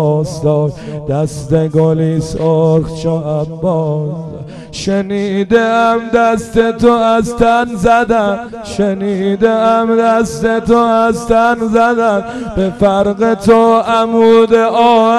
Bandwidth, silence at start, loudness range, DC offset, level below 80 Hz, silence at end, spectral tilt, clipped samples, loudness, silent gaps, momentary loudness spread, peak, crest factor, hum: 12.5 kHz; 0 s; 4 LU; under 0.1%; -36 dBFS; 0 s; -6.5 dB/octave; under 0.1%; -12 LUFS; none; 8 LU; 0 dBFS; 10 dB; none